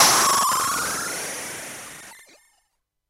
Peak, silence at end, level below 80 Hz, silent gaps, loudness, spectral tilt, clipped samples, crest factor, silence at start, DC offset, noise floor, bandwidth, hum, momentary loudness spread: -4 dBFS; 0.95 s; -60 dBFS; none; -21 LUFS; 0 dB/octave; under 0.1%; 20 dB; 0 s; under 0.1%; -74 dBFS; 16 kHz; none; 22 LU